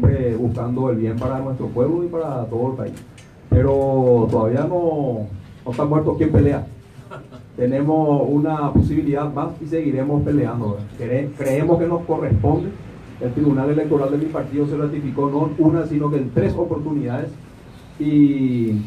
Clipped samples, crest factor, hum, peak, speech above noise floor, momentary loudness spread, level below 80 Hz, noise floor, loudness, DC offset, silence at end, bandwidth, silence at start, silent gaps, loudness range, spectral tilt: under 0.1%; 16 dB; none; -2 dBFS; 22 dB; 12 LU; -40 dBFS; -41 dBFS; -20 LUFS; under 0.1%; 0 s; 12.5 kHz; 0 s; none; 2 LU; -10 dB/octave